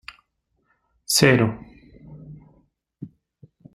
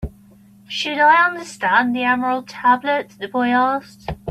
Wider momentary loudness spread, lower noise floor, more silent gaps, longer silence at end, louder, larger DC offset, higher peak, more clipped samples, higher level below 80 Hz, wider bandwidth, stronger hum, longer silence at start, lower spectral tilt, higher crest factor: first, 27 LU vs 13 LU; first, -72 dBFS vs -48 dBFS; neither; first, 0.7 s vs 0 s; about the same, -18 LUFS vs -18 LUFS; neither; about the same, -2 dBFS vs -2 dBFS; neither; second, -54 dBFS vs -44 dBFS; first, 16 kHz vs 13.5 kHz; neither; first, 1.1 s vs 0 s; about the same, -4 dB/octave vs -4.5 dB/octave; first, 24 dB vs 16 dB